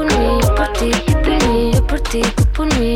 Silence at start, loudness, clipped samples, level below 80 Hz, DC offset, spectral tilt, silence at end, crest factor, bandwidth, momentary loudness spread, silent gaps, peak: 0 s; -16 LUFS; under 0.1%; -18 dBFS; under 0.1%; -5.5 dB/octave; 0 s; 8 dB; 17.5 kHz; 3 LU; none; -6 dBFS